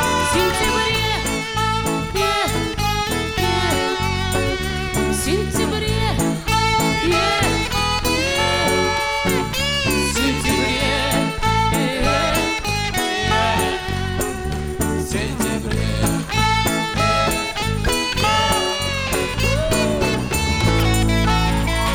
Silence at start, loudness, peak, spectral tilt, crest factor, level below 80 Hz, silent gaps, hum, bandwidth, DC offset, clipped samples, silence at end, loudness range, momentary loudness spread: 0 s; -19 LUFS; -4 dBFS; -4 dB/octave; 16 dB; -28 dBFS; none; none; 19.5 kHz; 0.4%; under 0.1%; 0 s; 2 LU; 4 LU